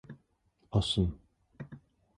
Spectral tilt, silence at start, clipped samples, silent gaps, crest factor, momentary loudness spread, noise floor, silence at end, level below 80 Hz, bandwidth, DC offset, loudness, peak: -6.5 dB/octave; 0.1 s; under 0.1%; none; 20 dB; 24 LU; -72 dBFS; 0.4 s; -46 dBFS; 11 kHz; under 0.1%; -32 LUFS; -16 dBFS